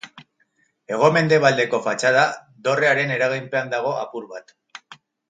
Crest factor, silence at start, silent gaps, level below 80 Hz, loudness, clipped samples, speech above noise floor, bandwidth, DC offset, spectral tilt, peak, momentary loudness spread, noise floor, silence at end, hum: 20 dB; 0.05 s; none; -70 dBFS; -19 LUFS; under 0.1%; 46 dB; 9.4 kHz; under 0.1%; -4.5 dB/octave; 0 dBFS; 16 LU; -66 dBFS; 0.35 s; none